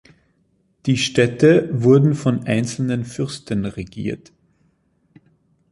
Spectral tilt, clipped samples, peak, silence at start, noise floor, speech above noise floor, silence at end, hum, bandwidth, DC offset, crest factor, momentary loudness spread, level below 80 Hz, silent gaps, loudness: -6.5 dB/octave; under 0.1%; -2 dBFS; 0.85 s; -63 dBFS; 46 dB; 1.55 s; none; 11.5 kHz; under 0.1%; 18 dB; 14 LU; -52 dBFS; none; -19 LUFS